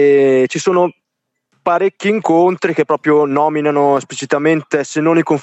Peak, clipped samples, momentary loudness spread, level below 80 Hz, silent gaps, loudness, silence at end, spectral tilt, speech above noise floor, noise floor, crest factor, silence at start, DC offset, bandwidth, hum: -2 dBFS; under 0.1%; 5 LU; -66 dBFS; none; -14 LUFS; 0 s; -5.5 dB/octave; 59 dB; -72 dBFS; 12 dB; 0 s; under 0.1%; 8.4 kHz; none